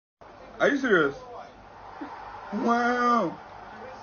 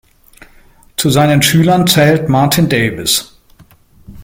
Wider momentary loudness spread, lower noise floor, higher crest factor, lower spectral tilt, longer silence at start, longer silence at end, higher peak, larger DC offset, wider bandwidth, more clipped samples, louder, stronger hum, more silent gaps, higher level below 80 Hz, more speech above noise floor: first, 22 LU vs 5 LU; about the same, -46 dBFS vs -45 dBFS; about the same, 18 dB vs 14 dB; about the same, -3.5 dB/octave vs -4.5 dB/octave; second, 0.2 s vs 1 s; about the same, 0 s vs 0 s; second, -10 dBFS vs 0 dBFS; neither; second, 6.8 kHz vs 17 kHz; neither; second, -25 LUFS vs -11 LUFS; neither; neither; second, -60 dBFS vs -42 dBFS; second, 22 dB vs 34 dB